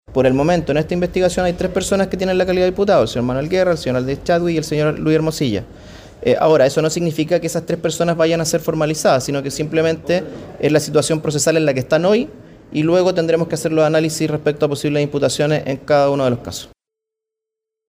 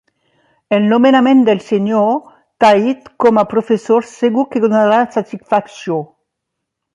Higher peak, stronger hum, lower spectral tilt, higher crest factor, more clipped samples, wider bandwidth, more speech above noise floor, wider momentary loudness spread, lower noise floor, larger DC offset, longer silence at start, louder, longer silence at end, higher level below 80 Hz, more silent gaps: second, -4 dBFS vs 0 dBFS; neither; about the same, -5.5 dB/octave vs -6.5 dB/octave; about the same, 14 dB vs 14 dB; neither; first, 16 kHz vs 10.5 kHz; first, 68 dB vs 64 dB; second, 6 LU vs 11 LU; first, -84 dBFS vs -76 dBFS; neither; second, 0.1 s vs 0.7 s; second, -17 LUFS vs -14 LUFS; first, 1.25 s vs 0.9 s; first, -42 dBFS vs -62 dBFS; neither